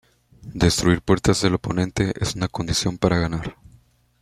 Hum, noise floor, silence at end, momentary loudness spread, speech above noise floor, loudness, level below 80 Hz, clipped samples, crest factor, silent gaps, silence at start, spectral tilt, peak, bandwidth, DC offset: none; -56 dBFS; 0.7 s; 8 LU; 35 dB; -21 LUFS; -40 dBFS; under 0.1%; 20 dB; none; 0.45 s; -5 dB/octave; -2 dBFS; 14.5 kHz; under 0.1%